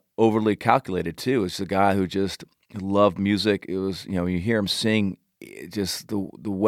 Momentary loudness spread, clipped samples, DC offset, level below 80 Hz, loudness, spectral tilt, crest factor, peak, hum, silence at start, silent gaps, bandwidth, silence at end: 13 LU; under 0.1%; under 0.1%; -56 dBFS; -24 LUFS; -5.5 dB/octave; 24 dB; 0 dBFS; none; 0.2 s; none; 15.5 kHz; 0 s